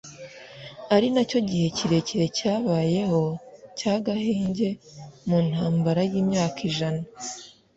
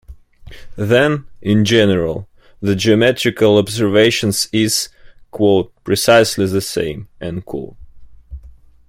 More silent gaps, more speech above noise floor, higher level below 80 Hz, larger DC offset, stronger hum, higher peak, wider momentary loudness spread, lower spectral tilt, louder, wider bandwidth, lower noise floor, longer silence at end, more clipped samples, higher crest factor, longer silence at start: neither; second, 19 dB vs 27 dB; second, -58 dBFS vs -44 dBFS; neither; neither; second, -6 dBFS vs 0 dBFS; about the same, 17 LU vs 15 LU; first, -6 dB/octave vs -4.5 dB/octave; second, -24 LUFS vs -15 LUFS; second, 8 kHz vs 16.5 kHz; about the same, -43 dBFS vs -41 dBFS; second, 0.25 s vs 0.4 s; neither; about the same, 18 dB vs 16 dB; about the same, 0.05 s vs 0.1 s